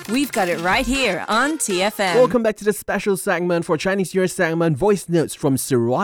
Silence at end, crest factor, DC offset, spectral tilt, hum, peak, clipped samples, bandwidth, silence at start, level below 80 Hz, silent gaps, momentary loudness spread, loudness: 0 s; 16 dB; under 0.1%; -4.5 dB/octave; none; -4 dBFS; under 0.1%; 19.5 kHz; 0 s; -44 dBFS; none; 4 LU; -19 LUFS